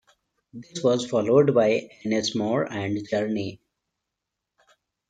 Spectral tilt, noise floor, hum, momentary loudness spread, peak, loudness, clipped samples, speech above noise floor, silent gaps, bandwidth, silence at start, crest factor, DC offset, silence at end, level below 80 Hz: -5.5 dB/octave; -84 dBFS; none; 11 LU; -6 dBFS; -24 LUFS; under 0.1%; 61 dB; none; 9.4 kHz; 0.55 s; 18 dB; under 0.1%; 1.55 s; -68 dBFS